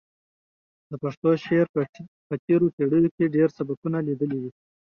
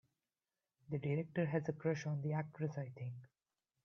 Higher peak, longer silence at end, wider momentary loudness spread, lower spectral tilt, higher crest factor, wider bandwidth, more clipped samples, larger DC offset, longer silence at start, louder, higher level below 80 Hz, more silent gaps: first, -8 dBFS vs -24 dBFS; second, 0.35 s vs 0.6 s; about the same, 12 LU vs 10 LU; first, -9.5 dB/octave vs -8 dB/octave; about the same, 16 dB vs 18 dB; about the same, 6.6 kHz vs 6.8 kHz; neither; neither; about the same, 0.9 s vs 0.9 s; first, -24 LUFS vs -41 LUFS; first, -64 dBFS vs -80 dBFS; first, 1.17-1.22 s, 1.69-1.74 s, 1.89-1.93 s, 2.08-2.30 s, 2.39-2.48 s, 2.73-2.78 s, 3.11-3.18 s, 3.77-3.82 s vs none